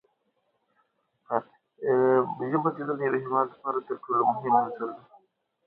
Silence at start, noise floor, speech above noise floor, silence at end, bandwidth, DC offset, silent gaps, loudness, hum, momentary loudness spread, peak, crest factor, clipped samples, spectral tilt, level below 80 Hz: 1.3 s; -74 dBFS; 48 dB; 0.7 s; 4.1 kHz; under 0.1%; none; -27 LUFS; none; 10 LU; -8 dBFS; 20 dB; under 0.1%; -11 dB/octave; -78 dBFS